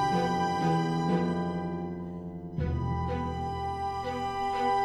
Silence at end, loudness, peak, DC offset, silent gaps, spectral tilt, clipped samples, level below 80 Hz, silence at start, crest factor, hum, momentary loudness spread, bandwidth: 0 s; -31 LUFS; -16 dBFS; under 0.1%; none; -7 dB/octave; under 0.1%; -44 dBFS; 0 s; 14 dB; none; 9 LU; 11.5 kHz